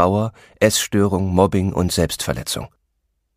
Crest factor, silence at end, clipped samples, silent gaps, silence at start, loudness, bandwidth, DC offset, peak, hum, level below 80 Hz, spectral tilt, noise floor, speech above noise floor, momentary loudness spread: 18 dB; 0.7 s; under 0.1%; none; 0 s; -19 LUFS; 15.5 kHz; under 0.1%; 0 dBFS; none; -40 dBFS; -5 dB/octave; -71 dBFS; 52 dB; 10 LU